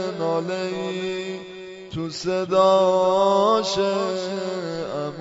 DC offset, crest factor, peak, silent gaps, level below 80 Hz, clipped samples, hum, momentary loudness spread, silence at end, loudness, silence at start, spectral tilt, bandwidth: under 0.1%; 16 dB; -6 dBFS; none; -60 dBFS; under 0.1%; none; 14 LU; 0 s; -22 LUFS; 0 s; -5 dB/octave; 8 kHz